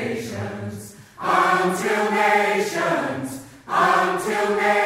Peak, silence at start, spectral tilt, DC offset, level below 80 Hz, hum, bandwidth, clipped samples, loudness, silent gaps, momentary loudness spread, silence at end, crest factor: -4 dBFS; 0 s; -4.5 dB/octave; under 0.1%; -62 dBFS; none; 16 kHz; under 0.1%; -21 LUFS; none; 15 LU; 0 s; 16 dB